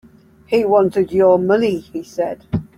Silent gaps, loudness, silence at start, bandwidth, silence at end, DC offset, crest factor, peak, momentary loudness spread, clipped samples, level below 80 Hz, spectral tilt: none; -17 LUFS; 0.5 s; 13 kHz; 0.15 s; under 0.1%; 14 dB; -2 dBFS; 11 LU; under 0.1%; -48 dBFS; -7.5 dB/octave